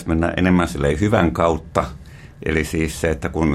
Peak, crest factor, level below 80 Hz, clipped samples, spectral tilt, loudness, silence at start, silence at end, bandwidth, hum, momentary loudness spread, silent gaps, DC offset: 0 dBFS; 18 dB; -34 dBFS; under 0.1%; -6.5 dB/octave; -19 LUFS; 0 s; 0 s; 14.5 kHz; none; 6 LU; none; under 0.1%